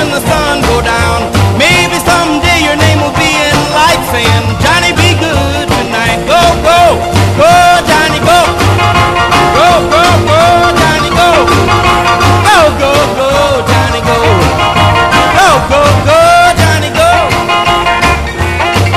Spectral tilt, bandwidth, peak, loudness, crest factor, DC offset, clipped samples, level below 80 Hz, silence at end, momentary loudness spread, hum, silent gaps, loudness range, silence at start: -4.5 dB/octave; 14.5 kHz; 0 dBFS; -7 LUFS; 8 dB; under 0.1%; 1%; -22 dBFS; 0 s; 4 LU; none; none; 2 LU; 0 s